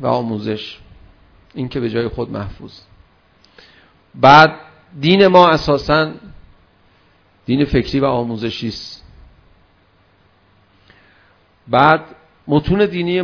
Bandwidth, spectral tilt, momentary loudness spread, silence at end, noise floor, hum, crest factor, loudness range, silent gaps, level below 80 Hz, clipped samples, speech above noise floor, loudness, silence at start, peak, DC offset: 5.4 kHz; -7 dB/octave; 23 LU; 0 s; -54 dBFS; none; 18 dB; 14 LU; none; -40 dBFS; 0.4%; 40 dB; -15 LUFS; 0 s; 0 dBFS; under 0.1%